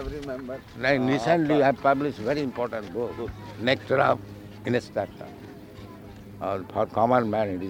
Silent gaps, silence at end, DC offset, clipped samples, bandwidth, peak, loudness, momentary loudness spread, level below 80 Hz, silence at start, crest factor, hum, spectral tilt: none; 0 s; under 0.1%; under 0.1%; 16.5 kHz; -6 dBFS; -26 LUFS; 21 LU; -50 dBFS; 0 s; 20 dB; none; -6.5 dB/octave